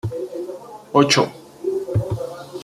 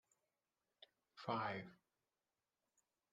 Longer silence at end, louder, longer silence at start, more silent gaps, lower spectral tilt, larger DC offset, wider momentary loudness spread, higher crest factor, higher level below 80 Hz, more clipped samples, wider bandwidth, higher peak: second, 0 s vs 1.4 s; first, -21 LUFS vs -46 LUFS; second, 0.05 s vs 0.8 s; neither; second, -4.5 dB/octave vs -6.5 dB/octave; neither; second, 16 LU vs 24 LU; about the same, 20 dB vs 24 dB; first, -50 dBFS vs -90 dBFS; neither; first, 15 kHz vs 9 kHz; first, -2 dBFS vs -28 dBFS